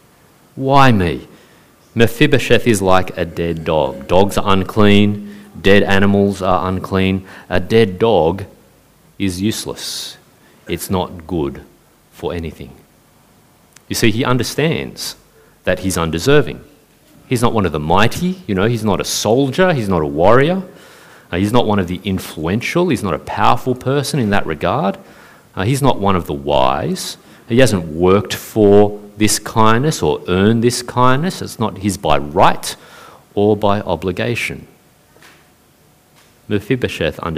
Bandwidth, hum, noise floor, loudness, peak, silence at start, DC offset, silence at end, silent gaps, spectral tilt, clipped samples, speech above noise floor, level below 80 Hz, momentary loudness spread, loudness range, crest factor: 16 kHz; none; -51 dBFS; -16 LUFS; 0 dBFS; 0 s; under 0.1%; 0 s; none; -5.5 dB/octave; under 0.1%; 36 dB; -38 dBFS; 12 LU; 9 LU; 16 dB